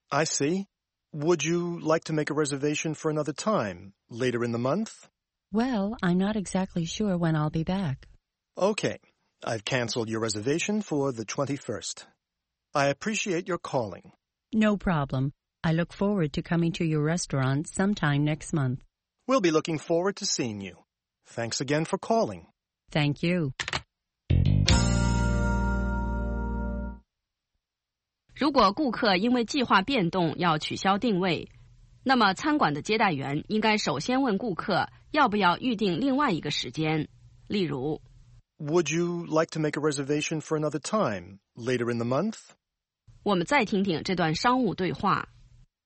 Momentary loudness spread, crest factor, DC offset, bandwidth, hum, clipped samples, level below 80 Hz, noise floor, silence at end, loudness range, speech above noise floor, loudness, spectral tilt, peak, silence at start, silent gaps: 10 LU; 24 dB; under 0.1%; 8.8 kHz; none; under 0.1%; -42 dBFS; -88 dBFS; 0.65 s; 4 LU; 61 dB; -27 LUFS; -5 dB/octave; -4 dBFS; 0.1 s; none